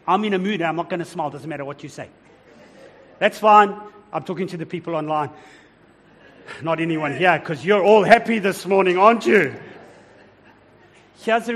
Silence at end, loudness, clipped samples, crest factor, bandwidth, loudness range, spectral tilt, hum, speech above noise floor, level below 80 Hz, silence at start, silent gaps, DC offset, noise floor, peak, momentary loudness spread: 0 s; -19 LUFS; under 0.1%; 20 dB; 15 kHz; 9 LU; -5.5 dB/octave; none; 33 dB; -64 dBFS; 0.05 s; none; under 0.1%; -52 dBFS; 0 dBFS; 18 LU